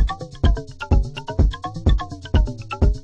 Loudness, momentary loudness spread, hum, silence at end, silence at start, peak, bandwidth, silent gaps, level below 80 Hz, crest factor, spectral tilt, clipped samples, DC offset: -23 LUFS; 4 LU; none; 0 s; 0 s; -4 dBFS; 7.8 kHz; none; -22 dBFS; 16 dB; -7.5 dB/octave; under 0.1%; under 0.1%